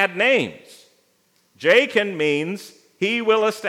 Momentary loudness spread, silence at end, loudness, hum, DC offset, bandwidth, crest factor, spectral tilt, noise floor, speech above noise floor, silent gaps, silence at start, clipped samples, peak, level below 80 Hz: 12 LU; 0 s; -19 LUFS; none; under 0.1%; 15.5 kHz; 20 dB; -4 dB/octave; -63 dBFS; 43 dB; none; 0 s; under 0.1%; -2 dBFS; -78 dBFS